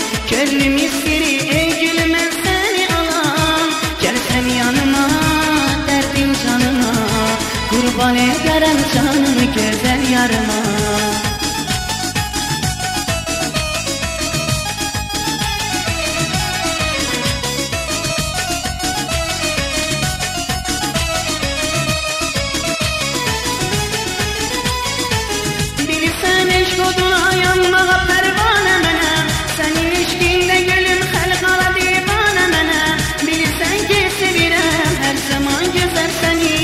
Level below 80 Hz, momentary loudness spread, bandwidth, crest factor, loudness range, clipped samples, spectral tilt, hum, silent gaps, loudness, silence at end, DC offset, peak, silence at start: -30 dBFS; 6 LU; 16 kHz; 14 dB; 5 LU; under 0.1%; -3 dB/octave; none; none; -15 LUFS; 0 s; under 0.1%; -2 dBFS; 0 s